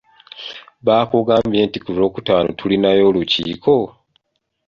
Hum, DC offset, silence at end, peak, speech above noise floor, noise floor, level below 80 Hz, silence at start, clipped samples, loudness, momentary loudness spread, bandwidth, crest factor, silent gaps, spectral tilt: none; under 0.1%; 0.8 s; -2 dBFS; 49 dB; -65 dBFS; -50 dBFS; 0.35 s; under 0.1%; -16 LUFS; 16 LU; 7.2 kHz; 16 dB; none; -7 dB/octave